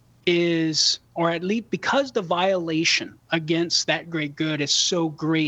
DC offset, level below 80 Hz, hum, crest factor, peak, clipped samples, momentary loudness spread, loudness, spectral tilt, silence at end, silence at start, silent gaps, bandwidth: under 0.1%; -66 dBFS; none; 16 dB; -6 dBFS; under 0.1%; 6 LU; -22 LUFS; -3.5 dB/octave; 0 s; 0.25 s; none; 8.4 kHz